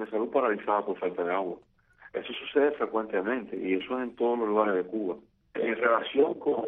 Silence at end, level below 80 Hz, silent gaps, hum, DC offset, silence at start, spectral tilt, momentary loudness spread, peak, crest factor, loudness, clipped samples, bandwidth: 0 s; -70 dBFS; none; none; under 0.1%; 0 s; -8 dB/octave; 10 LU; -10 dBFS; 18 dB; -29 LUFS; under 0.1%; 3.9 kHz